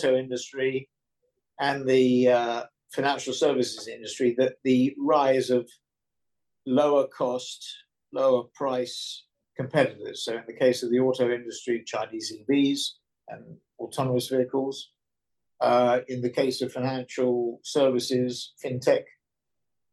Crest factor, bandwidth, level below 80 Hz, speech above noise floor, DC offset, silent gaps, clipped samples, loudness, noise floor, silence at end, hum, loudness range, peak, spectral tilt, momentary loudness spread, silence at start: 18 dB; 12.5 kHz; -76 dBFS; 63 dB; under 0.1%; none; under 0.1%; -26 LUFS; -88 dBFS; 0.9 s; none; 4 LU; -8 dBFS; -5 dB/octave; 14 LU; 0 s